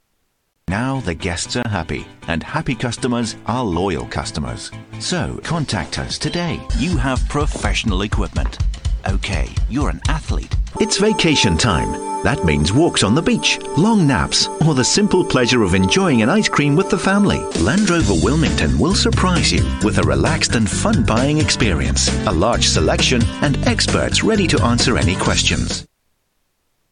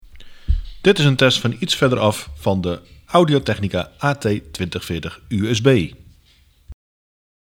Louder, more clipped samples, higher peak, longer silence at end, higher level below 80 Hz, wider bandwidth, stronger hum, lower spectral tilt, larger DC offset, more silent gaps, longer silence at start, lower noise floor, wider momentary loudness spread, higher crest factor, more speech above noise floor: about the same, -17 LUFS vs -19 LUFS; neither; about the same, -2 dBFS vs 0 dBFS; first, 1.05 s vs 0.75 s; first, -26 dBFS vs -34 dBFS; second, 10.5 kHz vs 17 kHz; neither; about the same, -4.5 dB/octave vs -5.5 dB/octave; neither; neither; first, 0.7 s vs 0.15 s; first, -67 dBFS vs -54 dBFS; second, 8 LU vs 11 LU; second, 14 dB vs 20 dB; first, 51 dB vs 36 dB